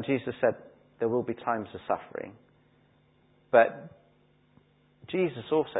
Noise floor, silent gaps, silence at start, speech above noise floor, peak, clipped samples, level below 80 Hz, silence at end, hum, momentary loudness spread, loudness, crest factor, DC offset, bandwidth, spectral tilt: -64 dBFS; none; 0 s; 36 dB; -6 dBFS; under 0.1%; -68 dBFS; 0 s; none; 18 LU; -29 LUFS; 24 dB; under 0.1%; 4 kHz; -10 dB/octave